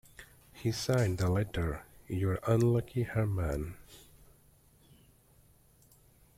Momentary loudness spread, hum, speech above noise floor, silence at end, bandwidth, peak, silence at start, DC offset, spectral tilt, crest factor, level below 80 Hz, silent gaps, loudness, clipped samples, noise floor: 18 LU; none; 33 dB; 2.4 s; 16 kHz; -14 dBFS; 0.2 s; under 0.1%; -6.5 dB/octave; 20 dB; -50 dBFS; none; -32 LUFS; under 0.1%; -63 dBFS